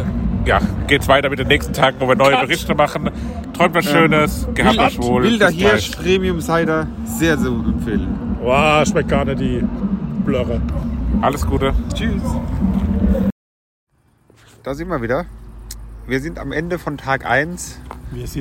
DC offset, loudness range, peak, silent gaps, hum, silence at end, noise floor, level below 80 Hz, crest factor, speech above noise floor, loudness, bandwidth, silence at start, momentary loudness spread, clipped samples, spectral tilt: under 0.1%; 8 LU; 0 dBFS; 13.32-13.87 s; none; 0 s; -54 dBFS; -28 dBFS; 16 dB; 37 dB; -17 LUFS; 16.5 kHz; 0 s; 11 LU; under 0.1%; -5.5 dB/octave